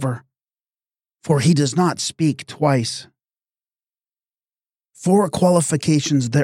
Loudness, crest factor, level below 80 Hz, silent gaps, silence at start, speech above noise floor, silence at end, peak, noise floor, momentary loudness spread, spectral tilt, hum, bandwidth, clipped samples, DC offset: -18 LUFS; 16 dB; -58 dBFS; none; 0 s; over 73 dB; 0 s; -4 dBFS; under -90 dBFS; 10 LU; -5.5 dB/octave; none; 15 kHz; under 0.1%; under 0.1%